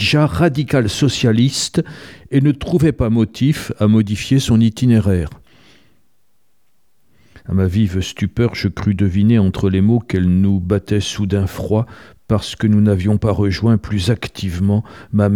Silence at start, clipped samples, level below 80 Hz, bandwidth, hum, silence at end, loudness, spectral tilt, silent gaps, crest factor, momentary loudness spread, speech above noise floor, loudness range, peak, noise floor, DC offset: 0 s; under 0.1%; -38 dBFS; 14.5 kHz; none; 0 s; -16 LUFS; -6.5 dB/octave; none; 14 dB; 7 LU; 52 dB; 5 LU; -2 dBFS; -67 dBFS; 0.3%